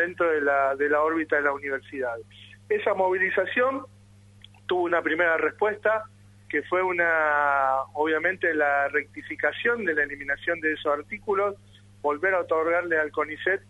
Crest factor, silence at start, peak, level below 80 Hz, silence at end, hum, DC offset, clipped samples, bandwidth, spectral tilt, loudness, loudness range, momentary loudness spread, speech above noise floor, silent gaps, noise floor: 16 dB; 0 s; -10 dBFS; -64 dBFS; 0.1 s; none; under 0.1%; under 0.1%; 11.5 kHz; -6 dB/octave; -25 LUFS; 3 LU; 8 LU; 26 dB; none; -52 dBFS